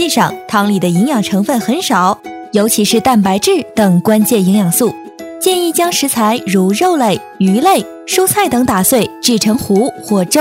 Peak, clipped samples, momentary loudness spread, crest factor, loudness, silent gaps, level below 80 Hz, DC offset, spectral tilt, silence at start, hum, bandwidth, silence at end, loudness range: 0 dBFS; under 0.1%; 5 LU; 12 dB; -12 LUFS; none; -50 dBFS; under 0.1%; -4.5 dB/octave; 0 s; none; 16.5 kHz; 0 s; 1 LU